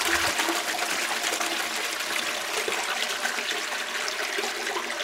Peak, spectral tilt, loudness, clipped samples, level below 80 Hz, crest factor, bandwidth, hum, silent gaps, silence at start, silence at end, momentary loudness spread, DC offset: -10 dBFS; 0 dB/octave; -26 LUFS; under 0.1%; -62 dBFS; 18 dB; 16 kHz; none; none; 0 s; 0 s; 4 LU; under 0.1%